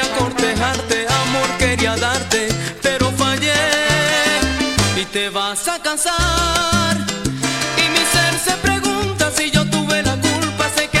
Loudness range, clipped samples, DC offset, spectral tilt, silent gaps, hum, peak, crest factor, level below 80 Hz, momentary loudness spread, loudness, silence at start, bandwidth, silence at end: 1 LU; under 0.1%; under 0.1%; -3 dB/octave; none; none; -2 dBFS; 16 dB; -34 dBFS; 5 LU; -16 LUFS; 0 s; 16.5 kHz; 0 s